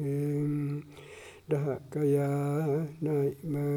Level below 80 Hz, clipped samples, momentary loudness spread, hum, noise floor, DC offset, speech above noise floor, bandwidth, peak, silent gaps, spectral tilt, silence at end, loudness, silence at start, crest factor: -68 dBFS; under 0.1%; 17 LU; none; -49 dBFS; under 0.1%; 20 dB; 15.5 kHz; -18 dBFS; none; -9 dB/octave; 0 s; -31 LUFS; 0 s; 14 dB